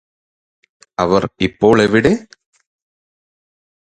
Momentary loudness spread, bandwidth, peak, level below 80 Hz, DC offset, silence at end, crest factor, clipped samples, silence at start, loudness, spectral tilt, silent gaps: 10 LU; 9.4 kHz; 0 dBFS; -44 dBFS; under 0.1%; 1.7 s; 18 dB; under 0.1%; 1 s; -15 LUFS; -6 dB/octave; none